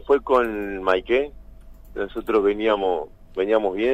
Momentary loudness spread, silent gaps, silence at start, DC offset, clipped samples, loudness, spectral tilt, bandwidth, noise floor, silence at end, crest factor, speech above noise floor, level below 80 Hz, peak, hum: 12 LU; none; 0 s; under 0.1%; under 0.1%; -22 LUFS; -6 dB/octave; 14.5 kHz; -43 dBFS; 0 s; 18 dB; 22 dB; -44 dBFS; -4 dBFS; none